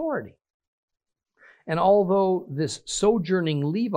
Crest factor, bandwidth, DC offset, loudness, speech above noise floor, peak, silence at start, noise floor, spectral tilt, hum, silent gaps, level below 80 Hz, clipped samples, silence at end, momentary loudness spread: 16 dB; 10 kHz; under 0.1%; -23 LUFS; 35 dB; -8 dBFS; 0 s; -58 dBFS; -5.5 dB/octave; none; 0.50-0.60 s, 0.67-0.88 s; -58 dBFS; under 0.1%; 0 s; 10 LU